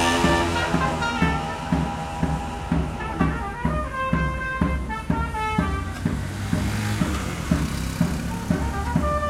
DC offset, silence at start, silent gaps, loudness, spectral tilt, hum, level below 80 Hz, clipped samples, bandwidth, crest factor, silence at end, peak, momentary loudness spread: under 0.1%; 0 s; none; -25 LUFS; -5.5 dB/octave; none; -32 dBFS; under 0.1%; 16 kHz; 18 dB; 0 s; -6 dBFS; 5 LU